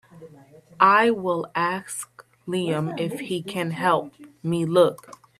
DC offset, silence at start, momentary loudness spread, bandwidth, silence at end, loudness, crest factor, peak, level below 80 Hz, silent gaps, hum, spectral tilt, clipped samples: under 0.1%; 0.15 s; 16 LU; 14 kHz; 0.45 s; -23 LUFS; 22 dB; -2 dBFS; -68 dBFS; none; none; -5 dB/octave; under 0.1%